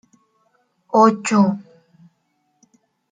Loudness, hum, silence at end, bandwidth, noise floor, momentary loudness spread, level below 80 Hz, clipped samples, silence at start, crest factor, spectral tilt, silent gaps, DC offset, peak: -16 LUFS; none; 1.5 s; 9.4 kHz; -68 dBFS; 7 LU; -70 dBFS; under 0.1%; 0.95 s; 18 dB; -6 dB/octave; none; under 0.1%; -2 dBFS